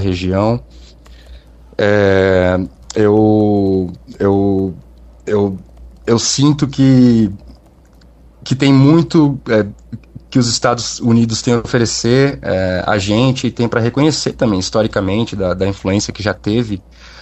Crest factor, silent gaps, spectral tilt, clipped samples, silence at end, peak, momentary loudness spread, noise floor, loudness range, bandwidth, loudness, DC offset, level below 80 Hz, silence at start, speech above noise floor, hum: 14 dB; none; -5.5 dB/octave; under 0.1%; 0 s; 0 dBFS; 11 LU; -44 dBFS; 3 LU; 8.6 kHz; -14 LUFS; under 0.1%; -40 dBFS; 0 s; 31 dB; none